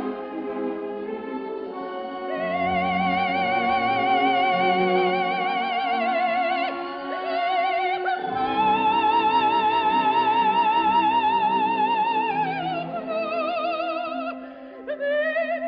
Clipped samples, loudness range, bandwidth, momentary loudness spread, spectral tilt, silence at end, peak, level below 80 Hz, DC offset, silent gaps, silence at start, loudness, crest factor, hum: under 0.1%; 6 LU; 5.4 kHz; 12 LU; -7.5 dB/octave; 0 s; -8 dBFS; -60 dBFS; under 0.1%; none; 0 s; -23 LUFS; 14 dB; none